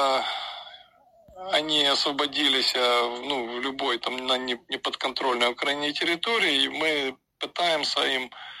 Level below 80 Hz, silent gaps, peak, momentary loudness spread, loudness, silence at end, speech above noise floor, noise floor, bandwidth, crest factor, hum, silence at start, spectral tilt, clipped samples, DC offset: -68 dBFS; none; -8 dBFS; 12 LU; -24 LUFS; 0 s; 30 dB; -56 dBFS; 14 kHz; 18 dB; none; 0 s; -1.5 dB/octave; under 0.1%; under 0.1%